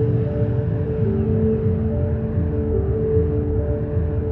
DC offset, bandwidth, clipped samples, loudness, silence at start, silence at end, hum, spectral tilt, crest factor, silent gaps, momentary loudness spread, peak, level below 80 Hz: under 0.1%; 3.3 kHz; under 0.1%; -21 LUFS; 0 s; 0 s; none; -13 dB/octave; 12 dB; none; 3 LU; -8 dBFS; -30 dBFS